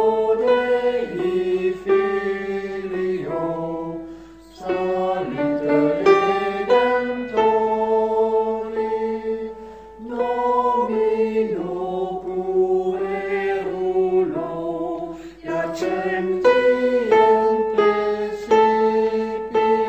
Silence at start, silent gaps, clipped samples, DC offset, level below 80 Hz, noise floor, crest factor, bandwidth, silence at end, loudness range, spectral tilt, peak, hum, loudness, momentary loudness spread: 0 s; none; under 0.1%; under 0.1%; -52 dBFS; -41 dBFS; 18 dB; 8.4 kHz; 0 s; 5 LU; -6.5 dB/octave; -2 dBFS; none; -20 LUFS; 10 LU